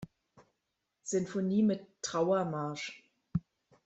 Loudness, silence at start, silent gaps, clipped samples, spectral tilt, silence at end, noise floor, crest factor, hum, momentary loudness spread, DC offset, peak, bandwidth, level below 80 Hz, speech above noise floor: -34 LUFS; 0 s; none; under 0.1%; -5.5 dB/octave; 0.45 s; -84 dBFS; 16 dB; none; 15 LU; under 0.1%; -18 dBFS; 8.2 kHz; -66 dBFS; 52 dB